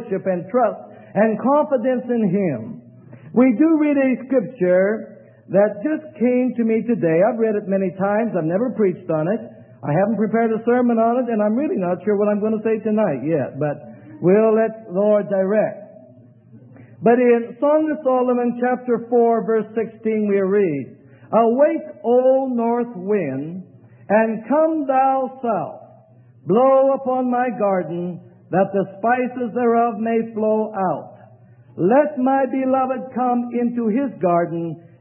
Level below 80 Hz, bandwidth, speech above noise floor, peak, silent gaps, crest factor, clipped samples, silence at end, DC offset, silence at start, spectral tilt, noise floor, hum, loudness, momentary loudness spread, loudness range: -70 dBFS; 3.4 kHz; 30 dB; -4 dBFS; none; 16 dB; under 0.1%; 0.2 s; under 0.1%; 0 s; -13 dB/octave; -49 dBFS; none; -19 LUFS; 9 LU; 2 LU